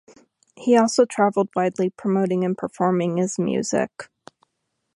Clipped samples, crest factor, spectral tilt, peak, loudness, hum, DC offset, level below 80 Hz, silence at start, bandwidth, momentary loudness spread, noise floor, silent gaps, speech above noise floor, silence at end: under 0.1%; 18 dB; -5.5 dB/octave; -4 dBFS; -21 LUFS; none; under 0.1%; -68 dBFS; 0.6 s; 11.5 kHz; 9 LU; -76 dBFS; none; 55 dB; 0.9 s